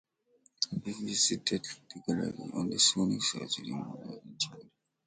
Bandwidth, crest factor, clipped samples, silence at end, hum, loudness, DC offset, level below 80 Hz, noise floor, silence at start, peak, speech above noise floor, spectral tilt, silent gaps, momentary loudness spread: 9.6 kHz; 24 dB; under 0.1%; 0.45 s; none; -31 LUFS; under 0.1%; -68 dBFS; -69 dBFS; 0.6 s; -10 dBFS; 36 dB; -2.5 dB/octave; none; 15 LU